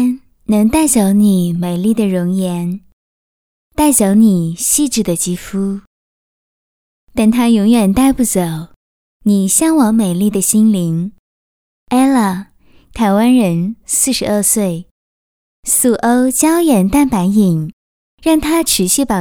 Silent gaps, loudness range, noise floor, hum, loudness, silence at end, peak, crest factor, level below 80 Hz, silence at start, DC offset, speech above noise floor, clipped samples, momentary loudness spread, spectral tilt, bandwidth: 2.93-3.70 s, 5.87-7.07 s, 8.76-9.20 s, 11.19-11.86 s, 14.91-15.63 s, 17.73-18.18 s; 2 LU; under -90 dBFS; none; -13 LUFS; 0 s; 0 dBFS; 14 dB; -40 dBFS; 0 s; under 0.1%; over 78 dB; under 0.1%; 10 LU; -5 dB/octave; 18.5 kHz